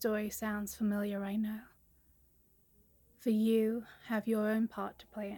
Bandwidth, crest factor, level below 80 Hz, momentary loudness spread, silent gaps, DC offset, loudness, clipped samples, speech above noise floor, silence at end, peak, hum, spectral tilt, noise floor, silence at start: 17.5 kHz; 16 dB; -68 dBFS; 12 LU; none; under 0.1%; -35 LUFS; under 0.1%; 34 dB; 0 s; -20 dBFS; none; -6 dB/octave; -68 dBFS; 0 s